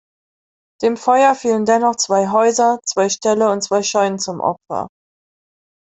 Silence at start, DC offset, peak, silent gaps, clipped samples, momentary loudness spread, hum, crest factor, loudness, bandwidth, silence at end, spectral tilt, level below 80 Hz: 0.8 s; under 0.1%; -2 dBFS; none; under 0.1%; 8 LU; none; 14 dB; -16 LUFS; 8.4 kHz; 1.05 s; -3.5 dB/octave; -64 dBFS